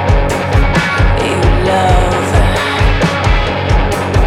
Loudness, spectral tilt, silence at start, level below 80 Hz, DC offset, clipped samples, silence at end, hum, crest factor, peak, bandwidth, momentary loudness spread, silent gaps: -12 LUFS; -5.5 dB/octave; 0 s; -16 dBFS; under 0.1%; under 0.1%; 0 s; none; 10 dB; 0 dBFS; 13.5 kHz; 2 LU; none